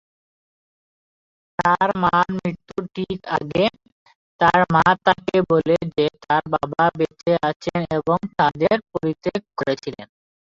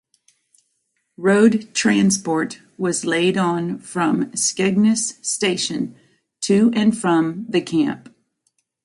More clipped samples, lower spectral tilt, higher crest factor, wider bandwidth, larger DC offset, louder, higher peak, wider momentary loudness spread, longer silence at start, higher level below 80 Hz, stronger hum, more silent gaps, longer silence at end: neither; first, -6.5 dB/octave vs -4.5 dB/octave; about the same, 18 dB vs 18 dB; second, 7.8 kHz vs 11.5 kHz; neither; about the same, -20 LUFS vs -19 LUFS; about the same, -2 dBFS vs -2 dBFS; about the same, 11 LU vs 9 LU; first, 1.6 s vs 1.2 s; first, -52 dBFS vs -62 dBFS; neither; first, 3.92-4.06 s, 4.15-4.39 s, 7.56-7.60 s vs none; second, 0.4 s vs 0.85 s